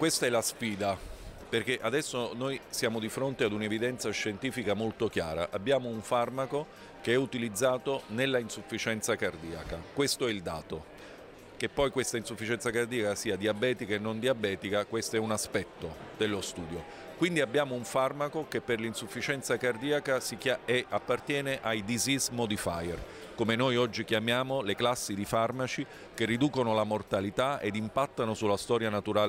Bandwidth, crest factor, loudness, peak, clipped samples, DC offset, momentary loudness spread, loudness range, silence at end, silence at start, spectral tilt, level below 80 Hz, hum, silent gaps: 16 kHz; 16 dB; -31 LUFS; -16 dBFS; under 0.1%; under 0.1%; 9 LU; 3 LU; 0 s; 0 s; -4 dB/octave; -58 dBFS; none; none